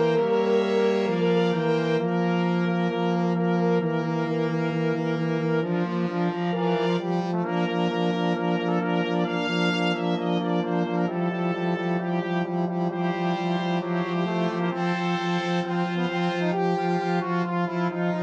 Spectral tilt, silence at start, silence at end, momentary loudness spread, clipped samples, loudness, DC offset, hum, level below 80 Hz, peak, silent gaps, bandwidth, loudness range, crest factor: -7.5 dB/octave; 0 s; 0 s; 4 LU; under 0.1%; -25 LUFS; under 0.1%; none; -70 dBFS; -10 dBFS; none; 7.4 kHz; 2 LU; 14 dB